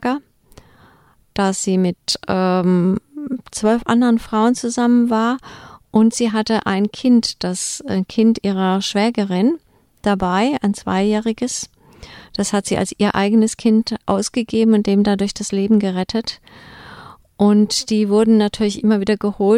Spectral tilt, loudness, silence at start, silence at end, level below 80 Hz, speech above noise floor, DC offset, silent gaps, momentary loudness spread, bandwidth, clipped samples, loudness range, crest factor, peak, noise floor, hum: -5 dB/octave; -17 LUFS; 0 s; 0 s; -48 dBFS; 36 dB; under 0.1%; none; 9 LU; 13 kHz; under 0.1%; 3 LU; 16 dB; -2 dBFS; -53 dBFS; none